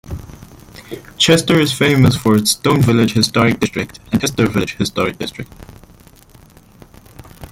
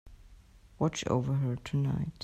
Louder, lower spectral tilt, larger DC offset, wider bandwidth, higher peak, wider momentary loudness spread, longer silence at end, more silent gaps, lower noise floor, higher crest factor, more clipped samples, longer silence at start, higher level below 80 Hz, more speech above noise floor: first, -15 LUFS vs -32 LUFS; second, -5 dB/octave vs -6.5 dB/octave; neither; first, 17 kHz vs 9 kHz; first, 0 dBFS vs -16 dBFS; first, 20 LU vs 3 LU; about the same, 0.05 s vs 0 s; neither; second, -44 dBFS vs -56 dBFS; about the same, 16 dB vs 16 dB; neither; about the same, 0.05 s vs 0.05 s; first, -42 dBFS vs -54 dBFS; first, 30 dB vs 25 dB